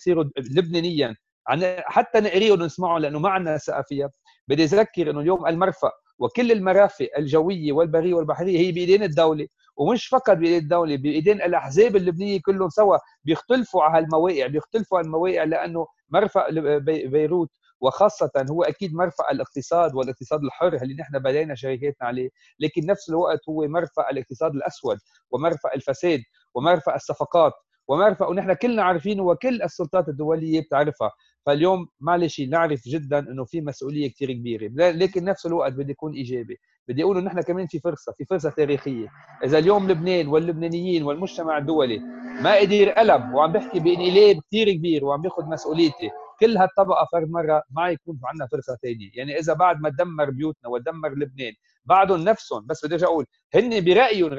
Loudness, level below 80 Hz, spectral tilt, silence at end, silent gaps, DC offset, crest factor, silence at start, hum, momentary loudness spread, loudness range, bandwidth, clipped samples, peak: -22 LUFS; -60 dBFS; -6.5 dB/octave; 0 s; 1.32-1.45 s, 4.41-4.47 s, 6.13-6.19 s, 17.75-17.80 s, 36.79-36.86 s, 53.44-53.50 s; under 0.1%; 18 dB; 0 s; none; 11 LU; 5 LU; 7.6 kHz; under 0.1%; -4 dBFS